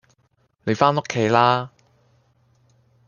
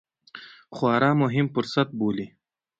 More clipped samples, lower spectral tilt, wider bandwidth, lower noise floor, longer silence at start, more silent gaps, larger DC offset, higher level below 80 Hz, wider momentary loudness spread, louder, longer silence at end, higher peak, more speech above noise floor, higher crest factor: neither; second, -5.5 dB/octave vs -7.5 dB/octave; about the same, 7.4 kHz vs 7.8 kHz; first, -65 dBFS vs -46 dBFS; first, 0.65 s vs 0.35 s; neither; neither; about the same, -64 dBFS vs -64 dBFS; second, 13 LU vs 22 LU; first, -20 LUFS vs -24 LUFS; first, 1.4 s vs 0.55 s; first, -2 dBFS vs -6 dBFS; first, 46 dB vs 23 dB; about the same, 22 dB vs 20 dB